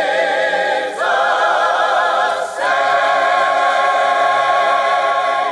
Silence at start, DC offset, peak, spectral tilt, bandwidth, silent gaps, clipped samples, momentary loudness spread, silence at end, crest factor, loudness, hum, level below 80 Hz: 0 s; under 0.1%; -4 dBFS; -1.5 dB/octave; 11.5 kHz; none; under 0.1%; 3 LU; 0 s; 12 dB; -15 LUFS; none; -70 dBFS